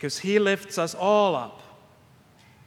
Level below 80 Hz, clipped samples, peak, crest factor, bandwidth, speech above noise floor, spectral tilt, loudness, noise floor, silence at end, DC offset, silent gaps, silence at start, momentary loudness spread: -72 dBFS; under 0.1%; -6 dBFS; 20 dB; 16 kHz; 32 dB; -4 dB/octave; -24 LUFS; -56 dBFS; 1.05 s; under 0.1%; none; 0 s; 9 LU